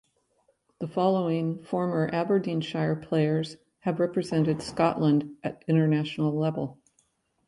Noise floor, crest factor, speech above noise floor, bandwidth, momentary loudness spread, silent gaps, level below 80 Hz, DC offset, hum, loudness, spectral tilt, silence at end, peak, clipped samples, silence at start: -70 dBFS; 18 dB; 44 dB; 11.5 kHz; 10 LU; none; -64 dBFS; under 0.1%; none; -27 LUFS; -7.5 dB/octave; 0.75 s; -8 dBFS; under 0.1%; 0.8 s